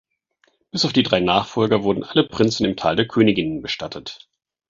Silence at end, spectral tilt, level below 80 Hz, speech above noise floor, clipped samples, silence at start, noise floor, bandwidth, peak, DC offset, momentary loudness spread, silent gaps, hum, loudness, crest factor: 0.55 s; -5.5 dB/octave; -50 dBFS; 45 dB; under 0.1%; 0.75 s; -64 dBFS; 7.8 kHz; -2 dBFS; under 0.1%; 11 LU; none; none; -19 LUFS; 20 dB